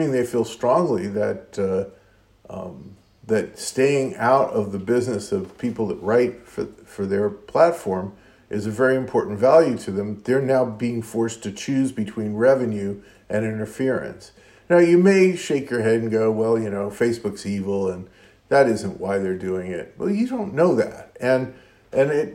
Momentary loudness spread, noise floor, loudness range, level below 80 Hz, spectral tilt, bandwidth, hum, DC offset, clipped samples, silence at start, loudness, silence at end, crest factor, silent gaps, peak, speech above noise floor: 11 LU; -54 dBFS; 4 LU; -60 dBFS; -6.5 dB/octave; 16 kHz; none; under 0.1%; under 0.1%; 0 s; -22 LUFS; 0 s; 20 dB; none; -2 dBFS; 33 dB